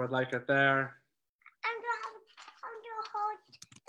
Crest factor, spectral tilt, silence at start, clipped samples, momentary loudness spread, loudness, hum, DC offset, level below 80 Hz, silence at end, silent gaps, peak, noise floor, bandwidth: 20 dB; -5.5 dB/octave; 0 s; under 0.1%; 21 LU; -33 LUFS; none; under 0.1%; -86 dBFS; 0.35 s; 1.29-1.39 s; -16 dBFS; -64 dBFS; 11.5 kHz